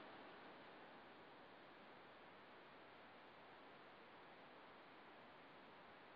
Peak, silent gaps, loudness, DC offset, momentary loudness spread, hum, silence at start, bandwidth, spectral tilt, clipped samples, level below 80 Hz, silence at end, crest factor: -48 dBFS; none; -62 LUFS; under 0.1%; 2 LU; none; 0 s; 5.2 kHz; -2 dB/octave; under 0.1%; under -90 dBFS; 0 s; 16 dB